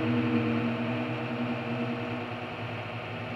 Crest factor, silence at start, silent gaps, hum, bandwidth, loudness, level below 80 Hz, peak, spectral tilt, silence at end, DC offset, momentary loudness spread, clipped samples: 16 dB; 0 s; none; none; 7.2 kHz; -31 LUFS; -62 dBFS; -14 dBFS; -8 dB/octave; 0 s; under 0.1%; 9 LU; under 0.1%